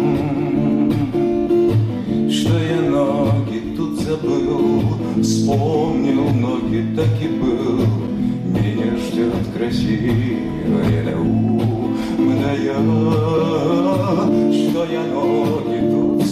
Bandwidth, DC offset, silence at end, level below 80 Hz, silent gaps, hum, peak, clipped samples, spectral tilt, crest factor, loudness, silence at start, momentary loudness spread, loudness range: 13.5 kHz; under 0.1%; 0 s; -40 dBFS; none; none; -8 dBFS; under 0.1%; -7.5 dB/octave; 10 dB; -18 LUFS; 0 s; 4 LU; 2 LU